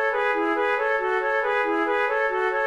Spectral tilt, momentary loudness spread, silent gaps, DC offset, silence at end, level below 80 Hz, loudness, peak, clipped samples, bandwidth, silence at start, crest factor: -3.5 dB/octave; 1 LU; none; 0.1%; 0 s; -58 dBFS; -23 LUFS; -12 dBFS; under 0.1%; 12 kHz; 0 s; 10 dB